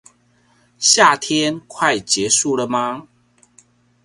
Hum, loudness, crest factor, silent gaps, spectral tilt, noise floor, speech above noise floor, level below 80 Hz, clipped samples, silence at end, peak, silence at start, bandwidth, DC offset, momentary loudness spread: 60 Hz at -50 dBFS; -16 LUFS; 20 dB; none; -1.5 dB/octave; -58 dBFS; 41 dB; -60 dBFS; under 0.1%; 1 s; 0 dBFS; 0.8 s; 11.5 kHz; under 0.1%; 11 LU